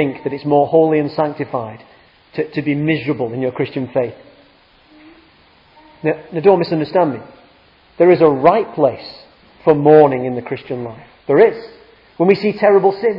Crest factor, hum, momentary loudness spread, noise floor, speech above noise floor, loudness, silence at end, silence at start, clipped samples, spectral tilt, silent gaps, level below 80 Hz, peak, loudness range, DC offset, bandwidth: 16 dB; none; 15 LU; -50 dBFS; 35 dB; -15 LUFS; 0 s; 0 s; under 0.1%; -10 dB/octave; none; -58 dBFS; 0 dBFS; 8 LU; under 0.1%; 5.6 kHz